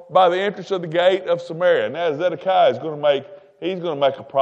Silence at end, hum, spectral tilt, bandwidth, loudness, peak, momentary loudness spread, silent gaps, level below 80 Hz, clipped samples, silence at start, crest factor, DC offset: 0 s; none; -6 dB/octave; 8 kHz; -20 LUFS; -2 dBFS; 8 LU; none; -72 dBFS; under 0.1%; 0 s; 18 dB; under 0.1%